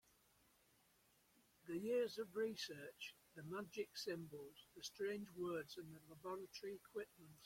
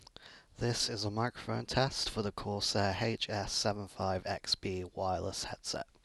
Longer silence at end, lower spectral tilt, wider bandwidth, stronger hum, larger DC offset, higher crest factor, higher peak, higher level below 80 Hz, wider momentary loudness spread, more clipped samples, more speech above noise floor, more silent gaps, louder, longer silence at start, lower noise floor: second, 0 s vs 0.2 s; about the same, -4.5 dB/octave vs -4 dB/octave; first, 16.5 kHz vs 12.5 kHz; neither; neither; about the same, 18 dB vs 20 dB; second, -32 dBFS vs -14 dBFS; second, -84 dBFS vs -56 dBFS; first, 13 LU vs 7 LU; neither; first, 28 dB vs 21 dB; neither; second, -49 LUFS vs -35 LUFS; first, 1.65 s vs 0.2 s; first, -77 dBFS vs -57 dBFS